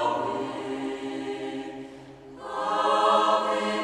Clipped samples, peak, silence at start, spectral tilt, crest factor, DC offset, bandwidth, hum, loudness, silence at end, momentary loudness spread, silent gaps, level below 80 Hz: under 0.1%; -10 dBFS; 0 s; -4 dB/octave; 18 dB; under 0.1%; 12 kHz; none; -26 LUFS; 0 s; 21 LU; none; -66 dBFS